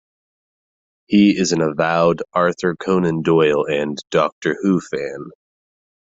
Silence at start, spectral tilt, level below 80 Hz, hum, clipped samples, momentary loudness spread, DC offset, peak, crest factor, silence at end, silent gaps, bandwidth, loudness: 1.1 s; -5.5 dB/octave; -56 dBFS; none; under 0.1%; 10 LU; under 0.1%; -2 dBFS; 16 dB; 0.9 s; 4.32-4.42 s; 7.8 kHz; -18 LUFS